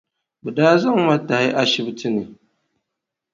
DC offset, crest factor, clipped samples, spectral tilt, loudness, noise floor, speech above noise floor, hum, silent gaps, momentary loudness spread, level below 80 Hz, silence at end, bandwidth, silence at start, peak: under 0.1%; 20 dB; under 0.1%; -5.5 dB/octave; -18 LUFS; -82 dBFS; 64 dB; none; none; 12 LU; -64 dBFS; 1 s; 7.6 kHz; 0.45 s; 0 dBFS